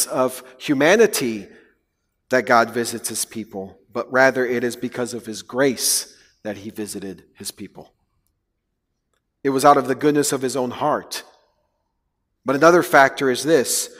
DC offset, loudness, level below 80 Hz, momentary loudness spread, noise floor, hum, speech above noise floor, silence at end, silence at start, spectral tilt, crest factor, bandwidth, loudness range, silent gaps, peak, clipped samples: under 0.1%; -19 LUFS; -64 dBFS; 18 LU; -75 dBFS; none; 56 dB; 0.1 s; 0 s; -3.5 dB/octave; 20 dB; 16 kHz; 6 LU; none; 0 dBFS; under 0.1%